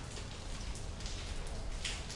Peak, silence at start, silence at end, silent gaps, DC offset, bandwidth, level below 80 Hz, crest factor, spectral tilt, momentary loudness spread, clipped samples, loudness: -24 dBFS; 0 s; 0 s; none; under 0.1%; 11.5 kHz; -44 dBFS; 16 dB; -3 dB/octave; 5 LU; under 0.1%; -43 LUFS